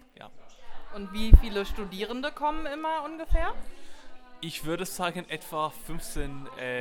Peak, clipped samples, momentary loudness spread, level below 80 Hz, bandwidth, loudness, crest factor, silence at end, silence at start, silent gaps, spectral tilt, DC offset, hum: 0 dBFS; under 0.1%; 21 LU; -28 dBFS; 16.5 kHz; -30 LUFS; 26 dB; 0 s; 0.25 s; none; -5.5 dB/octave; under 0.1%; none